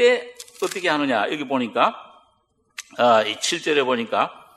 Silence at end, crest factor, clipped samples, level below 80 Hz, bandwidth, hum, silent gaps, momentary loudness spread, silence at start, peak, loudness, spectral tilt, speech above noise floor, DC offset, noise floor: 0.2 s; 20 dB; under 0.1%; -72 dBFS; 14.5 kHz; none; none; 19 LU; 0 s; -2 dBFS; -21 LUFS; -3 dB/octave; 44 dB; under 0.1%; -65 dBFS